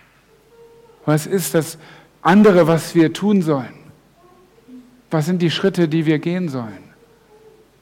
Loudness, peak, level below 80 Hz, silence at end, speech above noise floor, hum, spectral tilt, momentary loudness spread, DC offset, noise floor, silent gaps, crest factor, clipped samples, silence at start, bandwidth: -17 LUFS; -6 dBFS; -58 dBFS; 1.05 s; 37 dB; none; -6 dB/octave; 16 LU; under 0.1%; -53 dBFS; none; 14 dB; under 0.1%; 1.05 s; 17 kHz